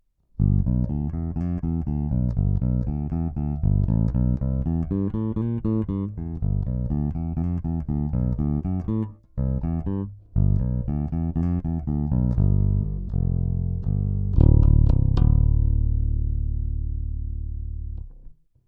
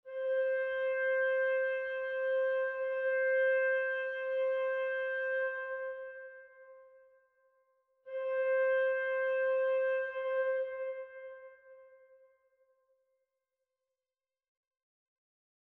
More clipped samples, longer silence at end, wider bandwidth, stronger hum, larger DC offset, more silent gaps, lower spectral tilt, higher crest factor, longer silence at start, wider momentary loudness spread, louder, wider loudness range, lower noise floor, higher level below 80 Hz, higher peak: neither; second, 0.35 s vs 3.8 s; second, 3.3 kHz vs 3.9 kHz; neither; neither; neither; first, -12.5 dB/octave vs 3.5 dB/octave; first, 18 dB vs 12 dB; first, 0.4 s vs 0.05 s; second, 10 LU vs 13 LU; first, -25 LUFS vs -33 LUFS; second, 5 LU vs 9 LU; second, -45 dBFS vs under -90 dBFS; first, -26 dBFS vs -82 dBFS; first, -4 dBFS vs -22 dBFS